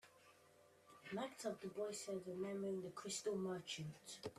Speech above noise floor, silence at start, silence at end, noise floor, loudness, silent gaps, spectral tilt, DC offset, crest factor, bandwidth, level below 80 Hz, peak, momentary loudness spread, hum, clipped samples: 23 dB; 0.05 s; 0 s; -70 dBFS; -47 LUFS; none; -4 dB/octave; under 0.1%; 16 dB; 14.5 kHz; -86 dBFS; -32 dBFS; 19 LU; none; under 0.1%